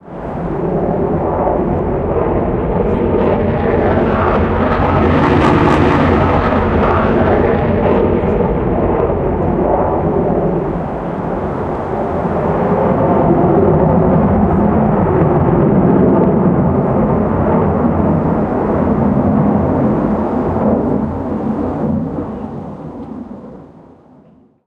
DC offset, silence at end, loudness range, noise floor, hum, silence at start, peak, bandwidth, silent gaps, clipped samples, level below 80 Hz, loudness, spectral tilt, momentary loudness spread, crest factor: under 0.1%; 1 s; 5 LU; -46 dBFS; none; 0.05 s; 0 dBFS; 7.8 kHz; none; under 0.1%; -28 dBFS; -14 LUFS; -10 dB/octave; 8 LU; 14 dB